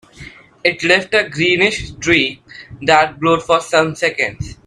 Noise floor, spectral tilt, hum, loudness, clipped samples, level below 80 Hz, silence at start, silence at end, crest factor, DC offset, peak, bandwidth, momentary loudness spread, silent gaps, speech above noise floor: -38 dBFS; -4 dB/octave; none; -15 LUFS; under 0.1%; -44 dBFS; 0.2 s; 0.15 s; 16 dB; under 0.1%; 0 dBFS; 12 kHz; 8 LU; none; 23 dB